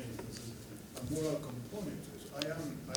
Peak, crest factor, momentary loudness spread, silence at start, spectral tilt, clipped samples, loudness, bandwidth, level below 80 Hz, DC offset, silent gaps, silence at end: -12 dBFS; 30 dB; 10 LU; 0 s; -5 dB/octave; under 0.1%; -41 LUFS; over 20 kHz; -60 dBFS; under 0.1%; none; 0 s